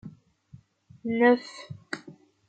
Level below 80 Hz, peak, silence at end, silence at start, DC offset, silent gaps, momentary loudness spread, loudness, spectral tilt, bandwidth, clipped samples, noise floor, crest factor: -72 dBFS; -8 dBFS; 0.4 s; 0.05 s; under 0.1%; none; 21 LU; -25 LUFS; -6 dB/octave; 9 kHz; under 0.1%; -55 dBFS; 22 dB